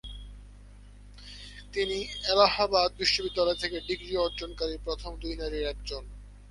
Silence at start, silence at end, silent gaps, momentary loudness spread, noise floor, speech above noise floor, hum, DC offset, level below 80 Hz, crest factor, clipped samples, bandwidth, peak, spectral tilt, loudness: 0.05 s; 0 s; none; 22 LU; -49 dBFS; 20 dB; 50 Hz at -45 dBFS; under 0.1%; -44 dBFS; 24 dB; under 0.1%; 11.5 kHz; -8 dBFS; -3.5 dB/octave; -28 LUFS